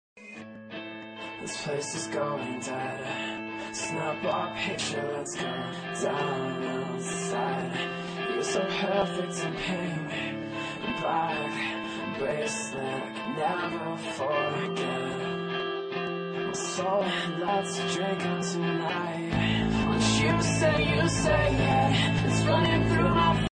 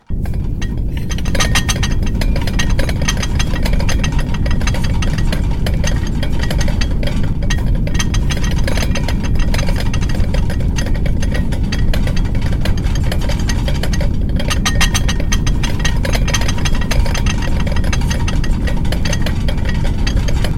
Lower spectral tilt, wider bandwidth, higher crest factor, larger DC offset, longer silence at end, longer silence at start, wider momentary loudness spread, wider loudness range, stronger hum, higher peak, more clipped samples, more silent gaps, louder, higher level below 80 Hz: about the same, -4.5 dB/octave vs -5 dB/octave; second, 10 kHz vs 15.5 kHz; about the same, 18 dB vs 14 dB; neither; about the same, 0.05 s vs 0 s; about the same, 0.15 s vs 0.1 s; first, 10 LU vs 3 LU; first, 7 LU vs 1 LU; neither; second, -12 dBFS vs 0 dBFS; neither; neither; second, -29 LUFS vs -18 LUFS; second, -46 dBFS vs -16 dBFS